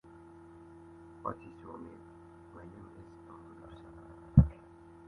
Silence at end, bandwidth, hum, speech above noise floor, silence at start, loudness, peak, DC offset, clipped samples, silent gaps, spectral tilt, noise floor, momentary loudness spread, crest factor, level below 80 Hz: 0.55 s; 3.9 kHz; none; 9 dB; 1.25 s; -30 LUFS; -8 dBFS; under 0.1%; under 0.1%; none; -11 dB/octave; -55 dBFS; 27 LU; 30 dB; -44 dBFS